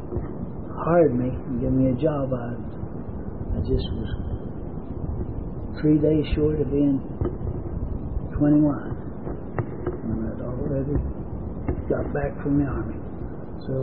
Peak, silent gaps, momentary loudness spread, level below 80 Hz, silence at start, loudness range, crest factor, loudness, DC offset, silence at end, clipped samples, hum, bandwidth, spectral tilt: -8 dBFS; none; 14 LU; -34 dBFS; 0 s; 5 LU; 18 dB; -26 LUFS; 1%; 0 s; under 0.1%; none; 4.7 kHz; -13 dB/octave